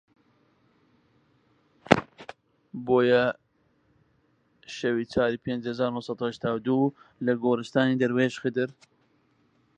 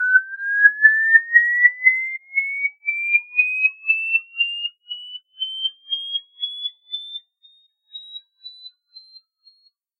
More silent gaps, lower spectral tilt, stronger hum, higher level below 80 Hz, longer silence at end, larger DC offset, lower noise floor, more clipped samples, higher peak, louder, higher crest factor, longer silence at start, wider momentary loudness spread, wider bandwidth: neither; first, -6.5 dB/octave vs 3 dB/octave; neither; first, -60 dBFS vs -84 dBFS; first, 1.05 s vs 0.8 s; neither; first, -67 dBFS vs -61 dBFS; neither; about the same, 0 dBFS vs 0 dBFS; second, -26 LUFS vs -18 LUFS; first, 28 dB vs 20 dB; first, 1.9 s vs 0 s; second, 15 LU vs 23 LU; about the same, 9.2 kHz vs 8.4 kHz